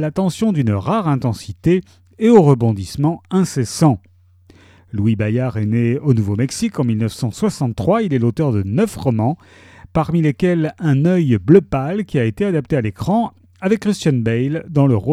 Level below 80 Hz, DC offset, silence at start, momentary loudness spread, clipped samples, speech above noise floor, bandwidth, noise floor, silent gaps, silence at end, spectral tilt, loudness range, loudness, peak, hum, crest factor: -46 dBFS; under 0.1%; 0 s; 8 LU; under 0.1%; 32 dB; 14.5 kHz; -49 dBFS; none; 0 s; -7.5 dB/octave; 3 LU; -17 LUFS; 0 dBFS; none; 16 dB